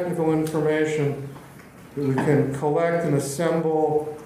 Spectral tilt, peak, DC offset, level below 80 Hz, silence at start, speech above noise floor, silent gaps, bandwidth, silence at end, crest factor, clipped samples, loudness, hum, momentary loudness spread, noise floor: -6.5 dB/octave; -6 dBFS; under 0.1%; -58 dBFS; 0 s; 22 dB; none; 15.5 kHz; 0 s; 16 dB; under 0.1%; -23 LUFS; none; 9 LU; -44 dBFS